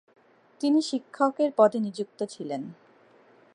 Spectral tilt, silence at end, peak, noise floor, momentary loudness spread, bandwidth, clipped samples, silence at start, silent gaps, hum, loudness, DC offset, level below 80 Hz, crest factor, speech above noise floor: -5.5 dB/octave; 0.8 s; -6 dBFS; -58 dBFS; 13 LU; 10.5 kHz; under 0.1%; 0.6 s; none; none; -26 LUFS; under 0.1%; -84 dBFS; 22 dB; 32 dB